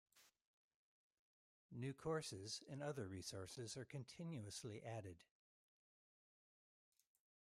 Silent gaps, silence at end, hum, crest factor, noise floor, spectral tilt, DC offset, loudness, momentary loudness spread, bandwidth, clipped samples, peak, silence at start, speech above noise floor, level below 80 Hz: 0.47-1.11 s, 1.19-1.69 s; 2.3 s; none; 20 dB; under -90 dBFS; -4.5 dB/octave; under 0.1%; -51 LUFS; 8 LU; 15 kHz; under 0.1%; -34 dBFS; 0.15 s; over 39 dB; -84 dBFS